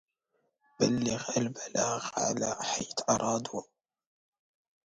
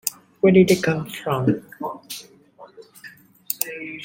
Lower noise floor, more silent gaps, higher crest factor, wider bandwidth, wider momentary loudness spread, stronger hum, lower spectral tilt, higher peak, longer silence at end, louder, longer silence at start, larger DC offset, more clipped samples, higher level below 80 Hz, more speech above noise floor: first, -78 dBFS vs -46 dBFS; neither; about the same, 20 dB vs 20 dB; second, 10.5 kHz vs 17 kHz; second, 4 LU vs 20 LU; neither; second, -3.5 dB/octave vs -5.5 dB/octave; second, -12 dBFS vs -2 dBFS; first, 1.2 s vs 0 s; second, -31 LUFS vs -21 LUFS; first, 0.8 s vs 0.05 s; neither; neither; second, -66 dBFS vs -58 dBFS; first, 47 dB vs 27 dB